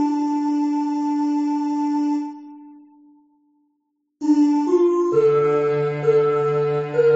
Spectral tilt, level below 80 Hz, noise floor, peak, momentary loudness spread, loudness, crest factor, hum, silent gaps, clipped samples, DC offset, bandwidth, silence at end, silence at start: -7.5 dB/octave; -68 dBFS; -72 dBFS; -6 dBFS; 5 LU; -20 LUFS; 14 dB; none; none; under 0.1%; under 0.1%; 7.8 kHz; 0 s; 0 s